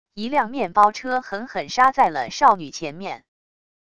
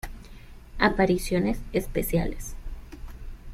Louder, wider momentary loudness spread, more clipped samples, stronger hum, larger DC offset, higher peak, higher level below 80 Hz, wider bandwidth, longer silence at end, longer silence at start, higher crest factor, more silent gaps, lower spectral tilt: first, -20 LUFS vs -26 LUFS; second, 14 LU vs 22 LU; neither; neither; first, 0.5% vs under 0.1%; first, -2 dBFS vs -6 dBFS; second, -60 dBFS vs -36 dBFS; second, 11 kHz vs 16 kHz; first, 0.8 s vs 0 s; about the same, 0.15 s vs 0.05 s; about the same, 20 dB vs 22 dB; neither; second, -3.5 dB/octave vs -5.5 dB/octave